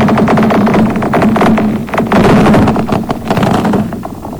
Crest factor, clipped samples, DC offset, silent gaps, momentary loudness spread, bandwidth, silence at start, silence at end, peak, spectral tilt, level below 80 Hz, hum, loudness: 8 dB; under 0.1%; under 0.1%; none; 8 LU; over 20 kHz; 0 s; 0 s; -2 dBFS; -7 dB/octave; -30 dBFS; none; -10 LUFS